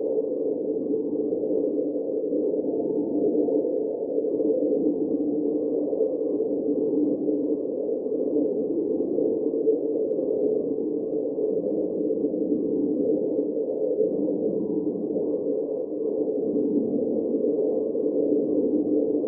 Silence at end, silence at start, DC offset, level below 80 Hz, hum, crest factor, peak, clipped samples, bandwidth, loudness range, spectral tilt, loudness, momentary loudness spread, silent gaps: 0 s; 0 s; under 0.1%; -68 dBFS; none; 14 dB; -10 dBFS; under 0.1%; 1.2 kHz; 1 LU; -4 dB/octave; -25 LUFS; 4 LU; none